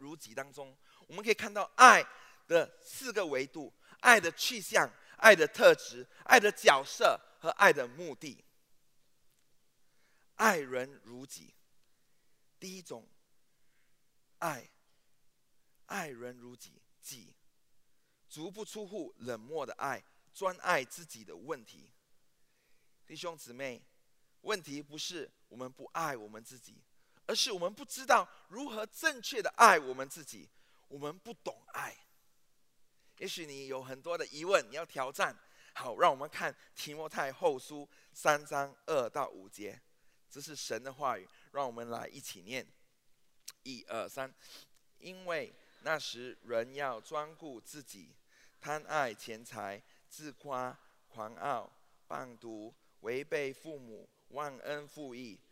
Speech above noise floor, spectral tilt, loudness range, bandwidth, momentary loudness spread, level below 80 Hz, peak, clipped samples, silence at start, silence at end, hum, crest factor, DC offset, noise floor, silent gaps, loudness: 36 dB; -2 dB/octave; 20 LU; 16 kHz; 24 LU; -84 dBFS; -2 dBFS; under 0.1%; 0 s; 0.15 s; none; 32 dB; under 0.1%; -69 dBFS; none; -31 LUFS